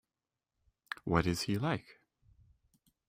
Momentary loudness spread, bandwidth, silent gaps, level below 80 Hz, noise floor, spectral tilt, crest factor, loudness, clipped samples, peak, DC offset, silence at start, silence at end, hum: 11 LU; 16 kHz; none; -58 dBFS; under -90 dBFS; -5.5 dB/octave; 26 dB; -34 LUFS; under 0.1%; -14 dBFS; under 0.1%; 1.05 s; 1.25 s; none